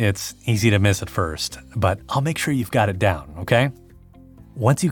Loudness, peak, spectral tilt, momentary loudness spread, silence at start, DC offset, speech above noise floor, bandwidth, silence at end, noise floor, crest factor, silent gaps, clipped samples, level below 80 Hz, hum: -21 LUFS; -4 dBFS; -5.5 dB/octave; 8 LU; 0 s; under 0.1%; 26 dB; 18 kHz; 0 s; -46 dBFS; 18 dB; none; under 0.1%; -46 dBFS; none